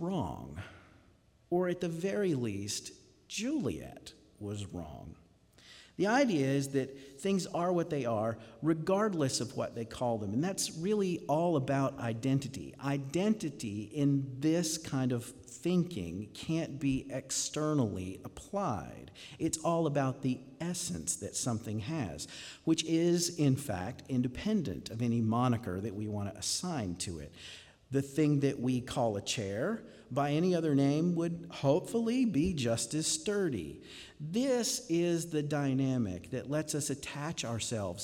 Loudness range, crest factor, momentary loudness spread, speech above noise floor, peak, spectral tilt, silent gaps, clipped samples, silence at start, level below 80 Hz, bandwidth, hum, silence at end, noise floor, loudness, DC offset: 4 LU; 18 dB; 12 LU; 32 dB; -16 dBFS; -5 dB/octave; none; under 0.1%; 0 s; -62 dBFS; 17 kHz; none; 0 s; -65 dBFS; -33 LUFS; under 0.1%